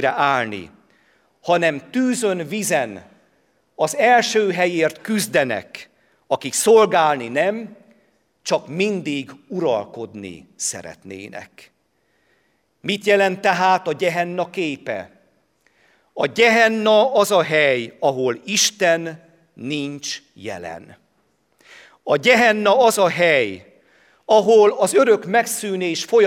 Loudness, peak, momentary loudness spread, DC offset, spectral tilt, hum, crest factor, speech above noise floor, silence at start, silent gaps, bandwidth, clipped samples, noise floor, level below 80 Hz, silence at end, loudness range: -18 LUFS; 0 dBFS; 19 LU; under 0.1%; -3.5 dB/octave; none; 20 dB; 47 dB; 0 s; none; 16.5 kHz; under 0.1%; -66 dBFS; -68 dBFS; 0 s; 9 LU